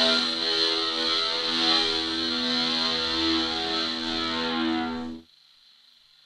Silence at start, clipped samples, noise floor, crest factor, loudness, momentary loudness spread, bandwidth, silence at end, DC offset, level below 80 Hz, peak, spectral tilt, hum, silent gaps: 0 s; under 0.1%; -57 dBFS; 18 dB; -24 LUFS; 6 LU; 12 kHz; 1.05 s; under 0.1%; -56 dBFS; -8 dBFS; -2 dB/octave; none; none